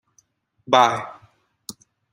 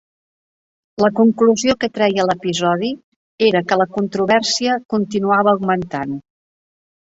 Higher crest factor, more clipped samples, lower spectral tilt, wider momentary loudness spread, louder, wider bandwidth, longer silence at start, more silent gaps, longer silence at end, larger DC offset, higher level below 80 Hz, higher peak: first, 22 dB vs 16 dB; neither; about the same, -3.5 dB/octave vs -4.5 dB/octave; first, 23 LU vs 10 LU; about the same, -19 LUFS vs -17 LUFS; first, 16 kHz vs 8 kHz; second, 0.7 s vs 1 s; second, none vs 3.04-3.38 s, 4.85-4.89 s; second, 0.4 s vs 0.9 s; neither; second, -68 dBFS vs -56 dBFS; about the same, -2 dBFS vs -2 dBFS